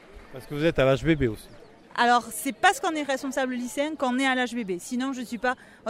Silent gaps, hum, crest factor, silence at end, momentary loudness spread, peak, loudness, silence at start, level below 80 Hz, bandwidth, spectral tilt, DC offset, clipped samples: none; none; 20 dB; 0 s; 10 LU; -6 dBFS; -26 LUFS; 0.1 s; -48 dBFS; 16 kHz; -4.5 dB/octave; under 0.1%; under 0.1%